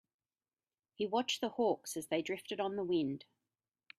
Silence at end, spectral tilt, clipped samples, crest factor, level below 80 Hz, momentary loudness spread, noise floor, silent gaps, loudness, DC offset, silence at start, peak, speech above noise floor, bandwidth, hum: 0.8 s; -4 dB/octave; under 0.1%; 18 dB; -80 dBFS; 6 LU; under -90 dBFS; none; -37 LUFS; under 0.1%; 1 s; -20 dBFS; over 54 dB; 15.5 kHz; none